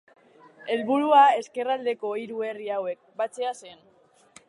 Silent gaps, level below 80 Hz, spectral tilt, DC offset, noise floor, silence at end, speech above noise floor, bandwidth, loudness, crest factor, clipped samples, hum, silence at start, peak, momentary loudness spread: none; -84 dBFS; -4 dB/octave; under 0.1%; -55 dBFS; 0.75 s; 31 dB; 11 kHz; -25 LUFS; 20 dB; under 0.1%; none; 0.65 s; -6 dBFS; 15 LU